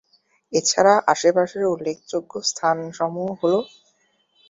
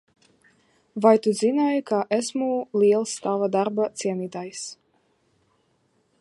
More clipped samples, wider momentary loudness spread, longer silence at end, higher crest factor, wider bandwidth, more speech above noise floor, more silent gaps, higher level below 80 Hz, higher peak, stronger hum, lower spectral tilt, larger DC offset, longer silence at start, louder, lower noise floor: neither; second, 11 LU vs 14 LU; second, 0.85 s vs 1.45 s; about the same, 20 dB vs 22 dB; second, 7.8 kHz vs 11.5 kHz; about the same, 44 dB vs 45 dB; neither; first, -68 dBFS vs -78 dBFS; about the same, -2 dBFS vs -4 dBFS; neither; second, -3 dB/octave vs -5 dB/octave; neither; second, 0.5 s vs 0.95 s; about the same, -21 LUFS vs -23 LUFS; about the same, -65 dBFS vs -67 dBFS